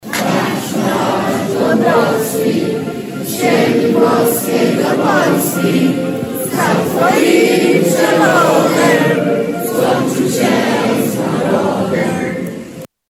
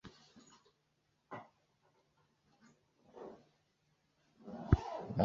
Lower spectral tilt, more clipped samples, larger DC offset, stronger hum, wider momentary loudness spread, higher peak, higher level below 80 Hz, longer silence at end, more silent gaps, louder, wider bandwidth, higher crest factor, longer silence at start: second, -5 dB/octave vs -8 dB/octave; neither; neither; neither; second, 8 LU vs 27 LU; first, 0 dBFS vs -14 dBFS; about the same, -54 dBFS vs -50 dBFS; first, 0.25 s vs 0 s; neither; first, -13 LUFS vs -39 LUFS; first, 17.5 kHz vs 7.2 kHz; second, 14 dB vs 30 dB; about the same, 0.05 s vs 0.05 s